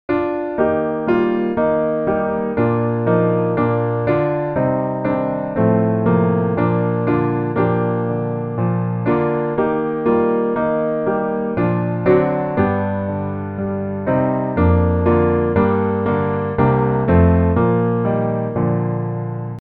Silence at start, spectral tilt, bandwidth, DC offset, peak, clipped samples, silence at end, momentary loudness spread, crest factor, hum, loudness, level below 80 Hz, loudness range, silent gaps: 0.1 s; -12 dB/octave; 4.5 kHz; under 0.1%; -2 dBFS; under 0.1%; 0 s; 6 LU; 16 dB; none; -18 LUFS; -38 dBFS; 3 LU; none